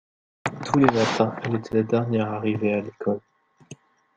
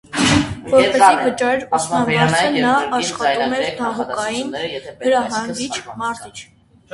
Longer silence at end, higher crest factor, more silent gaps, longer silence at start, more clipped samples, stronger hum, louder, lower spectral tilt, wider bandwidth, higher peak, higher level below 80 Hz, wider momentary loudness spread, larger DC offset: about the same, 0.45 s vs 0.5 s; about the same, 22 dB vs 18 dB; neither; first, 0.45 s vs 0.1 s; neither; neither; second, -24 LUFS vs -17 LUFS; first, -6.5 dB/octave vs -4 dB/octave; second, 9.2 kHz vs 11.5 kHz; about the same, -2 dBFS vs 0 dBFS; second, -60 dBFS vs -46 dBFS; about the same, 11 LU vs 12 LU; neither